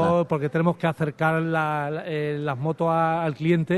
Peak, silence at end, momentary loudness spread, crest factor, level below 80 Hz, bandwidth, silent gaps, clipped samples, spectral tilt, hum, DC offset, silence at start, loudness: -8 dBFS; 0 s; 5 LU; 16 dB; -60 dBFS; 12 kHz; none; under 0.1%; -8 dB/octave; none; under 0.1%; 0 s; -24 LUFS